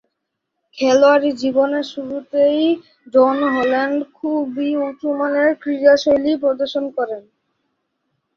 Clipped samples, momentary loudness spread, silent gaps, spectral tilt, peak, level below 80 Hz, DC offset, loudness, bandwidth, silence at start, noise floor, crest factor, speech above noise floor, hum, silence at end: under 0.1%; 10 LU; none; -4 dB/octave; -2 dBFS; -60 dBFS; under 0.1%; -17 LUFS; 7.2 kHz; 0.75 s; -77 dBFS; 16 dB; 60 dB; none; 1.15 s